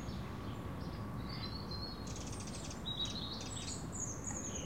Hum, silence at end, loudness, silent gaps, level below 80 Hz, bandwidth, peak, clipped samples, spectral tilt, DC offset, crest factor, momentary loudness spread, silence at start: none; 0 s; -42 LUFS; none; -52 dBFS; 16.5 kHz; -28 dBFS; under 0.1%; -3.5 dB/octave; 0.2%; 14 dB; 5 LU; 0 s